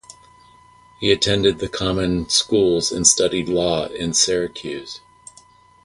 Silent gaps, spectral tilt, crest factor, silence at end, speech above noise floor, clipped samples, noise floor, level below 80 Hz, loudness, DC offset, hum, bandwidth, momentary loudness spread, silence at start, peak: none; -3 dB/octave; 20 dB; 0.9 s; 31 dB; under 0.1%; -50 dBFS; -44 dBFS; -18 LUFS; under 0.1%; none; 11.5 kHz; 15 LU; 0.1 s; 0 dBFS